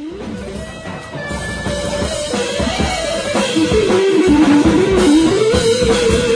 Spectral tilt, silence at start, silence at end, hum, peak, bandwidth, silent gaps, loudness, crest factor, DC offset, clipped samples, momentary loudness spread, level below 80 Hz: -5 dB/octave; 0 s; 0 s; none; -2 dBFS; 10.5 kHz; none; -14 LUFS; 14 dB; under 0.1%; under 0.1%; 16 LU; -30 dBFS